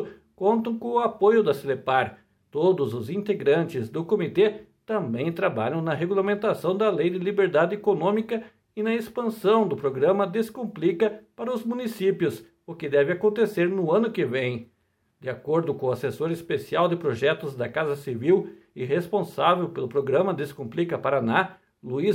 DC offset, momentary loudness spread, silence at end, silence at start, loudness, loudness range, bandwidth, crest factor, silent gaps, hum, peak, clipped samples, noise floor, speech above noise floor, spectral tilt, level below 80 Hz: under 0.1%; 9 LU; 0 s; 0 s; -25 LUFS; 2 LU; 16.5 kHz; 20 dB; none; none; -4 dBFS; under 0.1%; -66 dBFS; 41 dB; -7 dB/octave; -68 dBFS